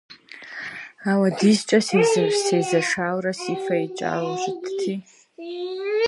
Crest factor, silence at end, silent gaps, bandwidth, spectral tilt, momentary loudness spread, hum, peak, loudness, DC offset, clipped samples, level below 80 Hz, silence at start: 18 dB; 0 s; none; 11.5 kHz; -4.5 dB/octave; 16 LU; none; -4 dBFS; -22 LUFS; under 0.1%; under 0.1%; -70 dBFS; 0.1 s